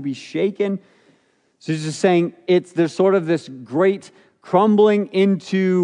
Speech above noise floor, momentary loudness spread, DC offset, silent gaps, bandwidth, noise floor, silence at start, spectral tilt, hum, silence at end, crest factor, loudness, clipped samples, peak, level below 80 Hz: 43 dB; 11 LU; under 0.1%; none; 10.5 kHz; -61 dBFS; 0 s; -7 dB/octave; none; 0 s; 16 dB; -19 LUFS; under 0.1%; -2 dBFS; -76 dBFS